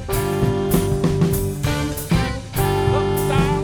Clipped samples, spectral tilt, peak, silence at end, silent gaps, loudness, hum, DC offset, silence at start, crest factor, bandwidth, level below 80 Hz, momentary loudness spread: under 0.1%; -6 dB/octave; -4 dBFS; 0 s; none; -20 LUFS; none; under 0.1%; 0 s; 16 dB; over 20 kHz; -30 dBFS; 4 LU